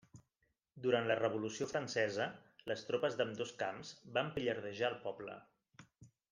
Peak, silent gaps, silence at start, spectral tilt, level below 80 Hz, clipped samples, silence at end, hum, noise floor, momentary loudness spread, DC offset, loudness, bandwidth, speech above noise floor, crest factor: -20 dBFS; none; 0.15 s; -4.5 dB/octave; -76 dBFS; under 0.1%; 0.25 s; none; -83 dBFS; 11 LU; under 0.1%; -39 LUFS; 10 kHz; 45 dB; 20 dB